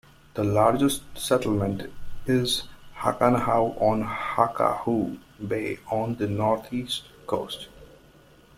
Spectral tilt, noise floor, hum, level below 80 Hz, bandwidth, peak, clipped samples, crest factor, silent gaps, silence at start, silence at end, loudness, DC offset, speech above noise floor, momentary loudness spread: -5.5 dB/octave; -54 dBFS; none; -48 dBFS; 16 kHz; -4 dBFS; under 0.1%; 22 dB; none; 0.35 s; 0.75 s; -25 LUFS; under 0.1%; 29 dB; 14 LU